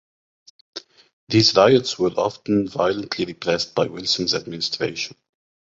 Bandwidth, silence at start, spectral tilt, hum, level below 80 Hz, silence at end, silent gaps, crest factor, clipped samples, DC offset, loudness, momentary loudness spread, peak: 8 kHz; 0.75 s; -4.5 dB/octave; none; -56 dBFS; 0.65 s; 1.13-1.27 s; 20 dB; under 0.1%; under 0.1%; -20 LUFS; 15 LU; -2 dBFS